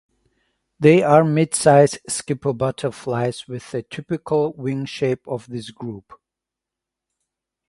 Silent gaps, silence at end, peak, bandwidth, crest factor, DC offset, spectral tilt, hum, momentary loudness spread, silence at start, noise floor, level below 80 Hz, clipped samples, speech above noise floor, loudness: none; 1.7 s; 0 dBFS; 11.5 kHz; 20 dB; under 0.1%; -5.5 dB/octave; none; 18 LU; 0.8 s; -86 dBFS; -58 dBFS; under 0.1%; 67 dB; -19 LUFS